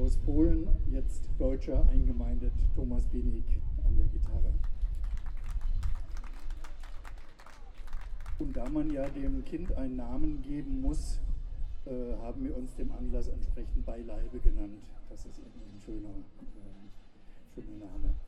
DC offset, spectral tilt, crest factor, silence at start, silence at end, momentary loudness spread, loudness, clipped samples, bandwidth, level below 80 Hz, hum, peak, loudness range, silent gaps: under 0.1%; -8.5 dB/octave; 18 dB; 0 s; 0 s; 19 LU; -36 LUFS; under 0.1%; 8.4 kHz; -30 dBFS; none; -10 dBFS; 10 LU; none